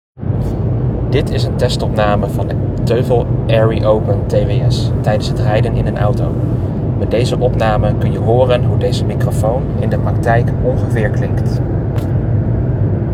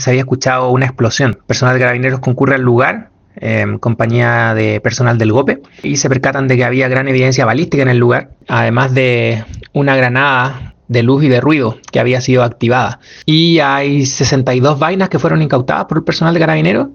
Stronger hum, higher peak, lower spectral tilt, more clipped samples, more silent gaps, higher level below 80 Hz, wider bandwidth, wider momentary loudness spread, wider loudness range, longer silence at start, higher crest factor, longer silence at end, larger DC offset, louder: neither; about the same, 0 dBFS vs 0 dBFS; first, -8 dB/octave vs -5.5 dB/octave; neither; neither; first, -26 dBFS vs -44 dBFS; first, 13 kHz vs 7.2 kHz; about the same, 4 LU vs 6 LU; about the same, 1 LU vs 1 LU; first, 0.15 s vs 0 s; about the same, 14 dB vs 12 dB; about the same, 0 s vs 0 s; neither; second, -15 LUFS vs -12 LUFS